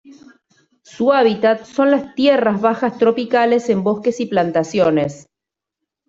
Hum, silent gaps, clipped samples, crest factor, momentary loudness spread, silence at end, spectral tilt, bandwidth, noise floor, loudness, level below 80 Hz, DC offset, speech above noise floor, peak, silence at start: none; none; under 0.1%; 14 dB; 5 LU; 0.9 s; -6 dB/octave; 7.8 kHz; -85 dBFS; -16 LUFS; -60 dBFS; under 0.1%; 69 dB; -2 dBFS; 0.1 s